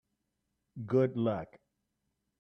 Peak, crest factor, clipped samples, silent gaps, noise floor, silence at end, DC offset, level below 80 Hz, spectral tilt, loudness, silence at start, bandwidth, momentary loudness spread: -16 dBFS; 20 dB; under 0.1%; none; -83 dBFS; 0.85 s; under 0.1%; -72 dBFS; -10 dB/octave; -32 LUFS; 0.75 s; 6 kHz; 21 LU